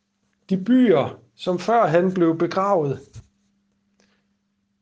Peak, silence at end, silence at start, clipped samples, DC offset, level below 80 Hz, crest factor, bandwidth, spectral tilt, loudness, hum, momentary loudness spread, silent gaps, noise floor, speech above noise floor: -4 dBFS; 1.6 s; 0.5 s; under 0.1%; under 0.1%; -62 dBFS; 18 dB; 7.8 kHz; -7.5 dB/octave; -20 LUFS; none; 11 LU; none; -70 dBFS; 51 dB